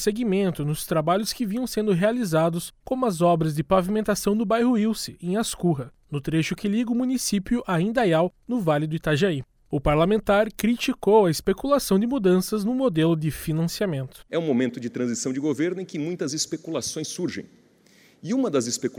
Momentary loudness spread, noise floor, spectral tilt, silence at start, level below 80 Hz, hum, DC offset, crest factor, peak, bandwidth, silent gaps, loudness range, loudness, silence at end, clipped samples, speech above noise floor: 8 LU; -56 dBFS; -5.5 dB/octave; 0 s; -48 dBFS; none; under 0.1%; 16 dB; -6 dBFS; over 20 kHz; none; 5 LU; -24 LUFS; 0 s; under 0.1%; 33 dB